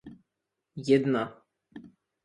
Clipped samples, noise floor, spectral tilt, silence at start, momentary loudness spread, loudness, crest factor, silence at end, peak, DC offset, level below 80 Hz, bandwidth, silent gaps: under 0.1%; -85 dBFS; -7 dB/octave; 0.05 s; 26 LU; -27 LUFS; 22 dB; 0.4 s; -10 dBFS; under 0.1%; -70 dBFS; 11 kHz; none